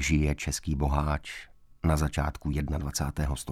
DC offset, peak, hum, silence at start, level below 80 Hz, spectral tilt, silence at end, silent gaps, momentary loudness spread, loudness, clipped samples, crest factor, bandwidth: under 0.1%; -14 dBFS; none; 0 s; -34 dBFS; -5.5 dB/octave; 0 s; none; 5 LU; -30 LUFS; under 0.1%; 16 dB; 15 kHz